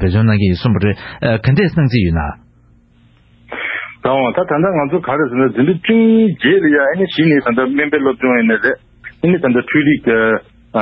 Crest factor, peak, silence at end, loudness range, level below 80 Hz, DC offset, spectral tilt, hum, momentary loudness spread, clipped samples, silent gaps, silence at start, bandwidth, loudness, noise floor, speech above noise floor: 12 dB; -2 dBFS; 0 s; 5 LU; -34 dBFS; under 0.1%; -11 dB/octave; none; 8 LU; under 0.1%; none; 0 s; 5.8 kHz; -14 LUFS; -49 dBFS; 36 dB